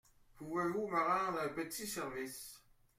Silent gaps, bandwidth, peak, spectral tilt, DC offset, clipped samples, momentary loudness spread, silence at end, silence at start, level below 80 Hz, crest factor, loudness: none; 16.5 kHz; -22 dBFS; -4 dB/octave; under 0.1%; under 0.1%; 14 LU; 0.4 s; 0.35 s; -70 dBFS; 18 dB; -38 LUFS